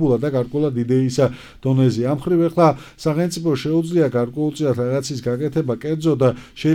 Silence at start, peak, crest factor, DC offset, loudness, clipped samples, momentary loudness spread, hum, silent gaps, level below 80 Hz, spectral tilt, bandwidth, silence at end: 0 s; -2 dBFS; 16 dB; under 0.1%; -19 LUFS; under 0.1%; 6 LU; none; none; -50 dBFS; -7.5 dB/octave; 16 kHz; 0 s